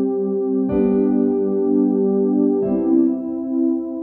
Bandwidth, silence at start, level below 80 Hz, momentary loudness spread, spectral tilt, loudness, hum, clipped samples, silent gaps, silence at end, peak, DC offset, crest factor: 2.7 kHz; 0 s; -50 dBFS; 4 LU; -13 dB/octave; -18 LUFS; none; under 0.1%; none; 0 s; -6 dBFS; under 0.1%; 12 dB